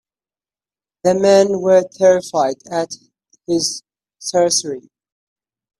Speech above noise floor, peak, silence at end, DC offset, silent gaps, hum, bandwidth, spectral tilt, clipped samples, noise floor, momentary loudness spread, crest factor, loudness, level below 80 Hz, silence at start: over 75 dB; 0 dBFS; 1 s; under 0.1%; none; none; 12.5 kHz; -3.5 dB/octave; under 0.1%; under -90 dBFS; 16 LU; 18 dB; -16 LUFS; -62 dBFS; 1.05 s